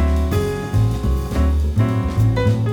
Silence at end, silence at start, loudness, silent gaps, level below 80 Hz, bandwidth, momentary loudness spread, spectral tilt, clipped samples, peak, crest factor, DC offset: 0 s; 0 s; -19 LUFS; none; -22 dBFS; 17.5 kHz; 4 LU; -7.5 dB/octave; under 0.1%; -6 dBFS; 12 dB; under 0.1%